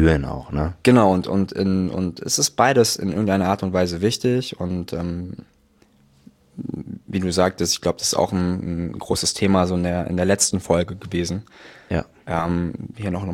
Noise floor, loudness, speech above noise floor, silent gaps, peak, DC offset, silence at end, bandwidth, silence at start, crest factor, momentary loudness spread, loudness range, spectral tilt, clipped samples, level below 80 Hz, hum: -57 dBFS; -21 LUFS; 36 dB; none; -2 dBFS; under 0.1%; 0 s; 17 kHz; 0 s; 20 dB; 12 LU; 7 LU; -4.5 dB/octave; under 0.1%; -40 dBFS; none